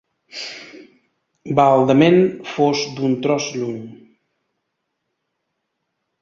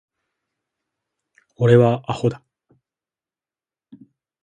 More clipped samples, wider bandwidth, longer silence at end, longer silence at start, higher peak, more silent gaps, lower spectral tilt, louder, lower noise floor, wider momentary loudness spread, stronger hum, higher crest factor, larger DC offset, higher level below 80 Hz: neither; second, 7.6 kHz vs 9.2 kHz; first, 2.25 s vs 2.05 s; second, 0.35 s vs 1.6 s; about the same, 0 dBFS vs -2 dBFS; neither; second, -6 dB/octave vs -8.5 dB/octave; about the same, -17 LUFS vs -18 LUFS; second, -75 dBFS vs under -90 dBFS; first, 19 LU vs 10 LU; neither; about the same, 20 dB vs 22 dB; neither; about the same, -60 dBFS vs -58 dBFS